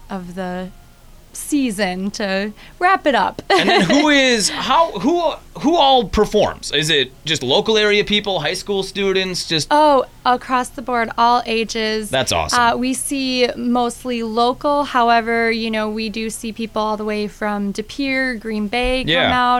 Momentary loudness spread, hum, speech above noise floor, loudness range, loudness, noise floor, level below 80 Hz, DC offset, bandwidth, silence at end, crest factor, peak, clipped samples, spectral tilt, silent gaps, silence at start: 10 LU; none; 26 dB; 5 LU; -17 LUFS; -43 dBFS; -40 dBFS; under 0.1%; 16.5 kHz; 0 s; 14 dB; -2 dBFS; under 0.1%; -3.5 dB/octave; none; 0 s